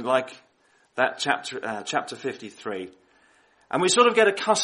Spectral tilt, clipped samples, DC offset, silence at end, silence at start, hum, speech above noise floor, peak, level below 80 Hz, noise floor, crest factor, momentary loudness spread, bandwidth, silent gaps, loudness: -2.5 dB/octave; under 0.1%; under 0.1%; 0 s; 0 s; none; 39 dB; -4 dBFS; -74 dBFS; -63 dBFS; 20 dB; 18 LU; 11.5 kHz; none; -24 LUFS